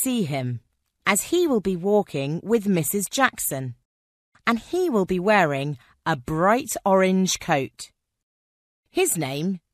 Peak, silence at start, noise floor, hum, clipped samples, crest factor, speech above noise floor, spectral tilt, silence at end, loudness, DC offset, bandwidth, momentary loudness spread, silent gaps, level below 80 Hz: -2 dBFS; 0 s; under -90 dBFS; none; under 0.1%; 20 dB; over 68 dB; -4.5 dB/octave; 0.15 s; -23 LUFS; under 0.1%; 14 kHz; 11 LU; 3.85-4.32 s, 8.23-8.83 s; -56 dBFS